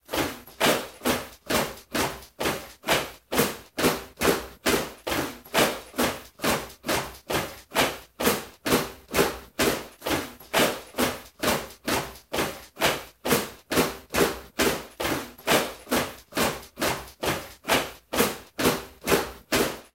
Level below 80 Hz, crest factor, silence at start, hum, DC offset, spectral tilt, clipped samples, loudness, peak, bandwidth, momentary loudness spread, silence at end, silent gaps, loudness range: -50 dBFS; 22 dB; 0.1 s; none; under 0.1%; -3 dB/octave; under 0.1%; -27 LUFS; -6 dBFS; 17 kHz; 6 LU; 0.1 s; none; 1 LU